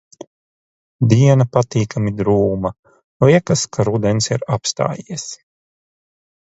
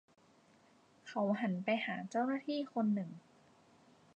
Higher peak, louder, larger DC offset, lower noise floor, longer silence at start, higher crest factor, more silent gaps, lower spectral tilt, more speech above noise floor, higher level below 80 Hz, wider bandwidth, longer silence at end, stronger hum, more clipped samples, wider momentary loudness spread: first, 0 dBFS vs -22 dBFS; first, -17 LUFS vs -37 LUFS; neither; first, under -90 dBFS vs -67 dBFS; about the same, 1 s vs 1.05 s; about the same, 18 dB vs 18 dB; first, 2.79-2.83 s, 3.04-3.20 s vs none; about the same, -6 dB/octave vs -7 dB/octave; first, over 74 dB vs 31 dB; first, -46 dBFS vs -88 dBFS; about the same, 8 kHz vs 8.4 kHz; first, 1.15 s vs 0.95 s; neither; neither; about the same, 14 LU vs 12 LU